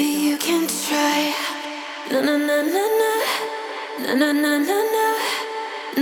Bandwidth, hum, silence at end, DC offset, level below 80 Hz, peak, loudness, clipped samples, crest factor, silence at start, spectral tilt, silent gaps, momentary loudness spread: 20 kHz; none; 0 s; under 0.1%; -74 dBFS; -4 dBFS; -21 LUFS; under 0.1%; 16 dB; 0 s; -2 dB/octave; none; 9 LU